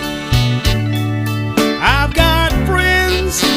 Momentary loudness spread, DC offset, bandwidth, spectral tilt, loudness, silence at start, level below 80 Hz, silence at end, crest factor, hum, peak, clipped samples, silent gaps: 5 LU; under 0.1%; 16.5 kHz; -4.5 dB/octave; -14 LUFS; 0 s; -22 dBFS; 0 s; 14 dB; none; 0 dBFS; under 0.1%; none